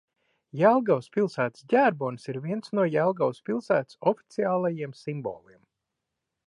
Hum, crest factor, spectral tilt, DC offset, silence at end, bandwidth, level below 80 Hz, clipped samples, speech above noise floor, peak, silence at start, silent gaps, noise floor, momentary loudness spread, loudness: none; 20 dB; -7.5 dB/octave; under 0.1%; 1.1 s; 11 kHz; -76 dBFS; under 0.1%; 58 dB; -8 dBFS; 0.55 s; none; -84 dBFS; 12 LU; -26 LUFS